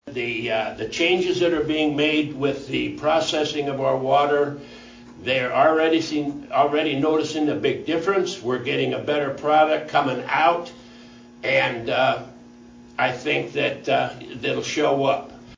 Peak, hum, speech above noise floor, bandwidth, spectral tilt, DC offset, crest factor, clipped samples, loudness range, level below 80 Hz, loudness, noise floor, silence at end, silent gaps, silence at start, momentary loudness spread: -4 dBFS; none; 24 dB; 7.6 kHz; -5 dB/octave; under 0.1%; 18 dB; under 0.1%; 3 LU; -56 dBFS; -22 LUFS; -45 dBFS; 0 s; none; 0.05 s; 8 LU